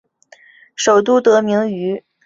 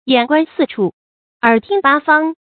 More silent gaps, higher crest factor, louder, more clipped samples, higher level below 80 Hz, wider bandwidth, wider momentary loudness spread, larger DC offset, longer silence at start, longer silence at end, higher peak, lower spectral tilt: second, none vs 0.93-1.40 s; about the same, 14 dB vs 16 dB; about the same, -15 LUFS vs -14 LUFS; neither; about the same, -64 dBFS vs -62 dBFS; first, 7.8 kHz vs 4.6 kHz; first, 11 LU vs 6 LU; neither; first, 0.8 s vs 0.05 s; about the same, 0.25 s vs 0.25 s; about the same, -2 dBFS vs 0 dBFS; second, -4.5 dB/octave vs -8 dB/octave